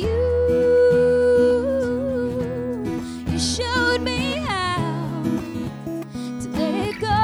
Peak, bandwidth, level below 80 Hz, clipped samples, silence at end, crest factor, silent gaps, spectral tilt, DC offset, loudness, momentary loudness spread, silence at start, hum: -8 dBFS; 13.5 kHz; -38 dBFS; under 0.1%; 0 s; 14 dB; none; -5.5 dB/octave; under 0.1%; -21 LUFS; 13 LU; 0 s; none